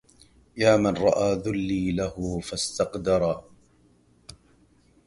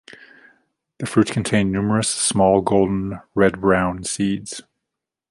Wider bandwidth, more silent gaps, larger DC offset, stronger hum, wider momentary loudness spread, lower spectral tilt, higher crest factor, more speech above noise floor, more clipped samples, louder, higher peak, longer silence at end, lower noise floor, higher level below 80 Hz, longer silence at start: about the same, 11.5 kHz vs 11.5 kHz; neither; neither; neither; about the same, 9 LU vs 10 LU; about the same, -5 dB/octave vs -5 dB/octave; about the same, 20 dB vs 18 dB; second, 36 dB vs 64 dB; neither; second, -25 LUFS vs -19 LUFS; second, -6 dBFS vs -2 dBFS; first, 1.65 s vs 0.7 s; second, -60 dBFS vs -83 dBFS; about the same, -48 dBFS vs -46 dBFS; second, 0.55 s vs 1 s